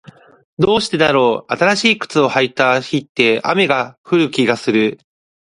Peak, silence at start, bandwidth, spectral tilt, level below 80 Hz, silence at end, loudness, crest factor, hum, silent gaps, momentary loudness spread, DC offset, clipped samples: 0 dBFS; 0.6 s; 11.5 kHz; -4.5 dB/octave; -54 dBFS; 0.5 s; -15 LUFS; 16 dB; none; 3.09-3.15 s, 3.98-4.04 s; 5 LU; under 0.1%; under 0.1%